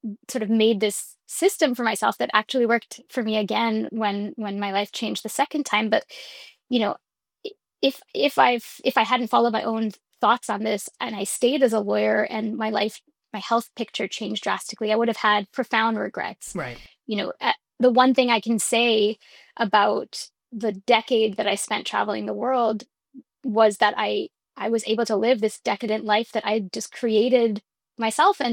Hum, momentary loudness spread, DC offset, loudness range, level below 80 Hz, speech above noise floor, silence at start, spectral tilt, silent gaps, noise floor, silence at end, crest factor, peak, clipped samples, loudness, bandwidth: none; 12 LU; under 0.1%; 4 LU; -68 dBFS; 27 dB; 0.05 s; -3.5 dB/octave; none; -50 dBFS; 0 s; 20 dB; -4 dBFS; under 0.1%; -23 LUFS; 19 kHz